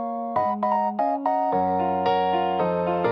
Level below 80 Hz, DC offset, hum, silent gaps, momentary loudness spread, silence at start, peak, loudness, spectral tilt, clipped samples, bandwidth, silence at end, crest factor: -66 dBFS; under 0.1%; none; none; 2 LU; 0 s; -10 dBFS; -23 LUFS; -8.5 dB/octave; under 0.1%; 6 kHz; 0 s; 14 dB